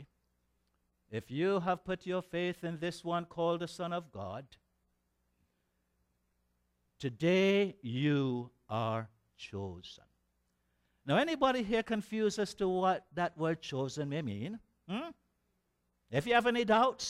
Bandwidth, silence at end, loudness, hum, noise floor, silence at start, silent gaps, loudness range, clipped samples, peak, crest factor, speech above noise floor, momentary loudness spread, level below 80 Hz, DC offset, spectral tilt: 14.5 kHz; 0 s; -34 LUFS; 60 Hz at -65 dBFS; -80 dBFS; 0 s; none; 7 LU; under 0.1%; -14 dBFS; 20 dB; 46 dB; 15 LU; -68 dBFS; under 0.1%; -5.5 dB/octave